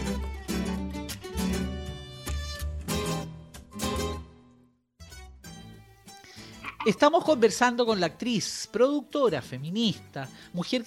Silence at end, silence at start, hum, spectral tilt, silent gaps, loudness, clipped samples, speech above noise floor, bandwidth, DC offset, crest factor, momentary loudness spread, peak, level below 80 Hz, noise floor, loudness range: 0 s; 0 s; none; -4.5 dB/octave; none; -28 LUFS; under 0.1%; 36 dB; 16.5 kHz; under 0.1%; 22 dB; 23 LU; -8 dBFS; -42 dBFS; -61 dBFS; 12 LU